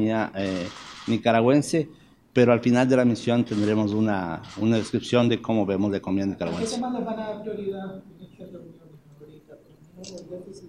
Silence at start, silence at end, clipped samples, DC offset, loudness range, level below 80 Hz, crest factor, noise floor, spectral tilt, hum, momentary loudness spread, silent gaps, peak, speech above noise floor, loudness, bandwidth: 0 s; 0 s; under 0.1%; under 0.1%; 13 LU; -60 dBFS; 20 dB; -50 dBFS; -6.5 dB/octave; none; 20 LU; none; -4 dBFS; 27 dB; -24 LUFS; 11.5 kHz